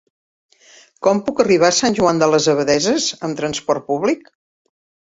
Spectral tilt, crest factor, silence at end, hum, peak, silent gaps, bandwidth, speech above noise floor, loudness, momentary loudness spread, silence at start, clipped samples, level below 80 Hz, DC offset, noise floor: -3.5 dB/octave; 16 dB; 0.85 s; none; -2 dBFS; none; 8 kHz; 32 dB; -17 LUFS; 8 LU; 1 s; under 0.1%; -56 dBFS; under 0.1%; -49 dBFS